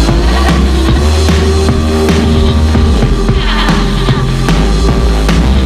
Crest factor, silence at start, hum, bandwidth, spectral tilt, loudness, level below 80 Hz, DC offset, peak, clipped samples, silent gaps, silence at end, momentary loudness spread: 8 dB; 0 s; none; 14.5 kHz; -6 dB/octave; -10 LUFS; -10 dBFS; under 0.1%; 0 dBFS; 0.3%; none; 0 s; 2 LU